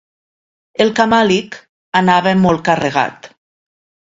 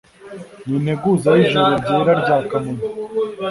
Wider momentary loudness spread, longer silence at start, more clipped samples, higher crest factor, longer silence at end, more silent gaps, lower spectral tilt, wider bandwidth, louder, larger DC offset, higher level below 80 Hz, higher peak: second, 12 LU vs 18 LU; first, 0.8 s vs 0.2 s; neither; about the same, 16 dB vs 16 dB; first, 0.85 s vs 0 s; first, 1.69-1.92 s vs none; second, -5.5 dB/octave vs -7 dB/octave; second, 7.8 kHz vs 11.5 kHz; first, -14 LUFS vs -17 LUFS; neither; about the same, -50 dBFS vs -52 dBFS; about the same, 0 dBFS vs -2 dBFS